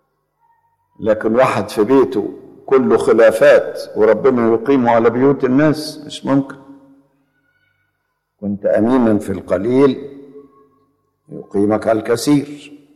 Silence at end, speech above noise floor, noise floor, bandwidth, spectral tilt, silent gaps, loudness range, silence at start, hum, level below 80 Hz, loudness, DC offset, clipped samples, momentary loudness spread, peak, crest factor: 0.2 s; 56 dB; -70 dBFS; 13.5 kHz; -6.5 dB/octave; none; 7 LU; 1 s; 50 Hz at -50 dBFS; -54 dBFS; -15 LUFS; under 0.1%; under 0.1%; 16 LU; -2 dBFS; 14 dB